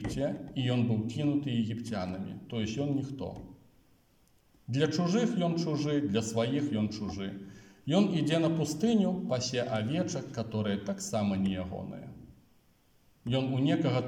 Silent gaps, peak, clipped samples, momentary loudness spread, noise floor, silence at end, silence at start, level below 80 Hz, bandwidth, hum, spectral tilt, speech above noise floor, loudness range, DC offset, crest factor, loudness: none; -14 dBFS; under 0.1%; 12 LU; -66 dBFS; 0 s; 0 s; -62 dBFS; 16 kHz; none; -6 dB/octave; 36 dB; 5 LU; under 0.1%; 18 dB; -31 LUFS